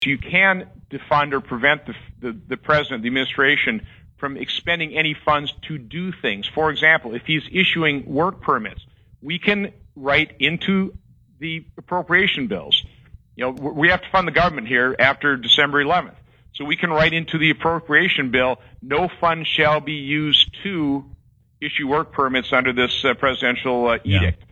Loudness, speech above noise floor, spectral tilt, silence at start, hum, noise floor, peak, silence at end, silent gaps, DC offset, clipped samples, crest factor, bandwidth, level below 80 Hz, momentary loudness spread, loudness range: -19 LUFS; 27 dB; -5.5 dB/octave; 0 s; none; -47 dBFS; 0 dBFS; 0.15 s; none; under 0.1%; under 0.1%; 20 dB; 8.2 kHz; -46 dBFS; 14 LU; 4 LU